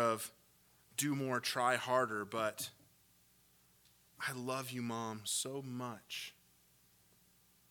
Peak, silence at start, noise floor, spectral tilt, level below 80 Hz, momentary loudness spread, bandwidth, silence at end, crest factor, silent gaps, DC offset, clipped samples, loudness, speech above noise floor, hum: -18 dBFS; 0 s; -70 dBFS; -3.5 dB/octave; -82 dBFS; 11 LU; 19 kHz; 1.4 s; 24 dB; none; under 0.1%; under 0.1%; -39 LUFS; 31 dB; 60 Hz at -75 dBFS